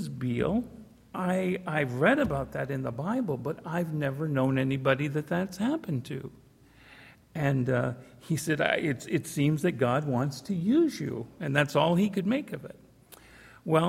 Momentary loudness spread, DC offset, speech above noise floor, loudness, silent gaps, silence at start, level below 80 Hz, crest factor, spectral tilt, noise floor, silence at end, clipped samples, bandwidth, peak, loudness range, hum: 11 LU; under 0.1%; 27 dB; -29 LUFS; none; 0 s; -58 dBFS; 22 dB; -6.5 dB/octave; -56 dBFS; 0 s; under 0.1%; 16 kHz; -8 dBFS; 4 LU; none